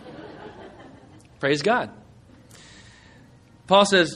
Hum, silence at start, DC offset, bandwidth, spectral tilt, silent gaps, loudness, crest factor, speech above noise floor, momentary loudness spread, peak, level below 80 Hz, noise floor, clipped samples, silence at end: none; 0.05 s; under 0.1%; 11.5 kHz; -4 dB/octave; none; -20 LUFS; 22 dB; 32 dB; 26 LU; -4 dBFS; -60 dBFS; -51 dBFS; under 0.1%; 0 s